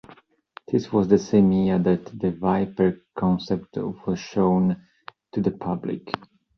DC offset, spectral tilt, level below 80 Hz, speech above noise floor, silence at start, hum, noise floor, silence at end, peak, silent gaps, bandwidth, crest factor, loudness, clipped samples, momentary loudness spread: under 0.1%; -8 dB/octave; -52 dBFS; 30 dB; 0.7 s; none; -52 dBFS; 0.4 s; -4 dBFS; none; 6.6 kHz; 20 dB; -23 LUFS; under 0.1%; 12 LU